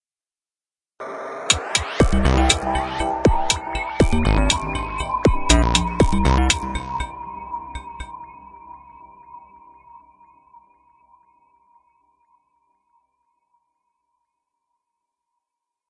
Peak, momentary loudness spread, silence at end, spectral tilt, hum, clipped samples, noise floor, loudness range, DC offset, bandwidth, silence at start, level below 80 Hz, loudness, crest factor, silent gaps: 0 dBFS; 19 LU; 5.9 s; -4 dB/octave; none; under 0.1%; under -90 dBFS; 18 LU; under 0.1%; 11.5 kHz; 1 s; -28 dBFS; -20 LUFS; 22 dB; none